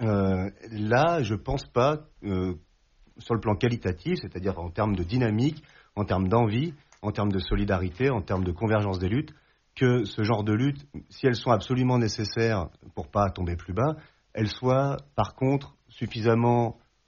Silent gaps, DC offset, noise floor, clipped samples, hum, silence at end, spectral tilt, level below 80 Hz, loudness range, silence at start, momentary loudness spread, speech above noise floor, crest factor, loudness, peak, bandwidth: none; under 0.1%; -60 dBFS; under 0.1%; none; 0.35 s; -6.5 dB/octave; -46 dBFS; 2 LU; 0 s; 10 LU; 35 dB; 18 dB; -27 LUFS; -8 dBFS; 7.2 kHz